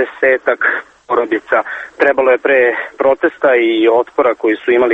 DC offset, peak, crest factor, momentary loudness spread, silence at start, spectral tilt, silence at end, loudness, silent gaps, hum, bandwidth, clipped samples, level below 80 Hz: under 0.1%; 0 dBFS; 14 dB; 5 LU; 0 s; -5.5 dB/octave; 0 s; -13 LUFS; none; none; 7.8 kHz; under 0.1%; -56 dBFS